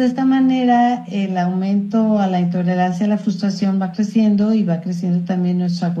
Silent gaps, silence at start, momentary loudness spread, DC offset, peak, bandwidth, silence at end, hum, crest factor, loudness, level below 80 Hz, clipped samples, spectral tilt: none; 0 s; 5 LU; under 0.1%; -4 dBFS; 7.8 kHz; 0 s; none; 12 dB; -17 LUFS; -64 dBFS; under 0.1%; -8 dB/octave